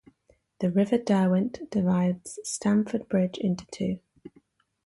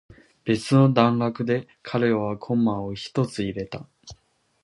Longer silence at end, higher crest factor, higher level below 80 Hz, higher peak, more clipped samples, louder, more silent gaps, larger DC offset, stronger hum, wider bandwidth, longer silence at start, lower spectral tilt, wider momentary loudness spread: about the same, 0.6 s vs 0.5 s; second, 16 dB vs 22 dB; second, -62 dBFS vs -56 dBFS; second, -12 dBFS vs -2 dBFS; neither; second, -27 LUFS vs -23 LUFS; neither; neither; neither; about the same, 11.5 kHz vs 11.5 kHz; first, 0.6 s vs 0.45 s; about the same, -6.5 dB/octave vs -7 dB/octave; second, 9 LU vs 13 LU